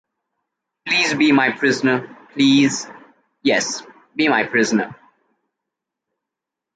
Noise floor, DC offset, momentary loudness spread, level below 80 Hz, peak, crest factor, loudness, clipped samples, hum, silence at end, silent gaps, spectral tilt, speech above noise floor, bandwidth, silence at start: -85 dBFS; under 0.1%; 15 LU; -66 dBFS; -4 dBFS; 18 dB; -17 LUFS; under 0.1%; none; 1.8 s; none; -3.5 dB/octave; 67 dB; 9.2 kHz; 0.85 s